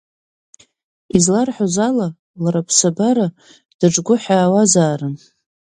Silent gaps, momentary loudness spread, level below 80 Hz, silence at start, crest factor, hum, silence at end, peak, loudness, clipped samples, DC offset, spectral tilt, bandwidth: 2.19-2.34 s, 3.74-3.79 s; 11 LU; -54 dBFS; 1.15 s; 18 dB; none; 0.6 s; 0 dBFS; -16 LUFS; under 0.1%; under 0.1%; -4.5 dB/octave; 11 kHz